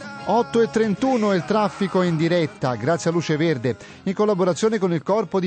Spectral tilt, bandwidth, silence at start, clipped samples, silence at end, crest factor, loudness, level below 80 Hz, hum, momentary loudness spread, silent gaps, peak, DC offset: -6.5 dB/octave; 9.2 kHz; 0 s; under 0.1%; 0 s; 12 dB; -21 LUFS; -60 dBFS; none; 5 LU; none; -8 dBFS; under 0.1%